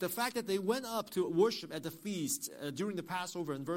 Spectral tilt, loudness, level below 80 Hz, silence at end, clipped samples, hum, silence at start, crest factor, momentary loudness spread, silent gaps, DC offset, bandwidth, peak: -4 dB/octave; -36 LUFS; -76 dBFS; 0 s; under 0.1%; none; 0 s; 18 dB; 9 LU; none; under 0.1%; 16.5 kHz; -18 dBFS